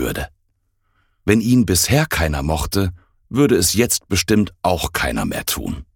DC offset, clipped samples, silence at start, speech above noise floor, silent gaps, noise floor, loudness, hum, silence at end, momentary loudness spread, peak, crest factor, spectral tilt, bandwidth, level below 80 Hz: under 0.1%; under 0.1%; 0 s; 48 dB; none; -66 dBFS; -18 LUFS; none; 0.15 s; 10 LU; 0 dBFS; 18 dB; -4.5 dB/octave; 18 kHz; -34 dBFS